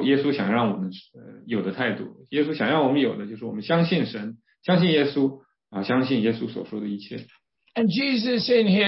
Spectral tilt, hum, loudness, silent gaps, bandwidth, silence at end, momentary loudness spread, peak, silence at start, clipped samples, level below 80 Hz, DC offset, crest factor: -10 dB/octave; none; -24 LUFS; none; 5.8 kHz; 0 s; 13 LU; -8 dBFS; 0 s; under 0.1%; -68 dBFS; under 0.1%; 16 dB